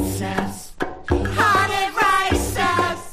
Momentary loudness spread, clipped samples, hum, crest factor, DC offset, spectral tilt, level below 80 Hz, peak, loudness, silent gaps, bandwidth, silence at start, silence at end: 13 LU; under 0.1%; none; 18 dB; under 0.1%; -4 dB/octave; -34 dBFS; -4 dBFS; -20 LUFS; none; 15.5 kHz; 0 s; 0 s